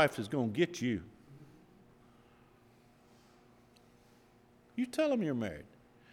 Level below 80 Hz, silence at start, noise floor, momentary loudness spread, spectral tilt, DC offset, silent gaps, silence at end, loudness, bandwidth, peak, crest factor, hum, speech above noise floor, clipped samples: -70 dBFS; 0 s; -64 dBFS; 25 LU; -6 dB/octave; under 0.1%; none; 0.45 s; -35 LUFS; 16.5 kHz; -14 dBFS; 24 dB; none; 31 dB; under 0.1%